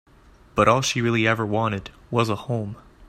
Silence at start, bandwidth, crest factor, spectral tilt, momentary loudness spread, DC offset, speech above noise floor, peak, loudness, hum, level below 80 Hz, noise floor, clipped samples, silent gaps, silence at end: 0.55 s; 14.5 kHz; 20 dB; -5 dB/octave; 11 LU; under 0.1%; 29 dB; -4 dBFS; -22 LUFS; none; -50 dBFS; -52 dBFS; under 0.1%; none; 0.05 s